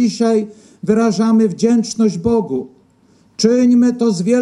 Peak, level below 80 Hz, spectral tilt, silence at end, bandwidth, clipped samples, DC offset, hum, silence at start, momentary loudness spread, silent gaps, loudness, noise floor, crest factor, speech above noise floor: 0 dBFS; -52 dBFS; -6 dB/octave; 0 s; 10.5 kHz; under 0.1%; under 0.1%; none; 0 s; 12 LU; none; -15 LUFS; -52 dBFS; 14 dB; 38 dB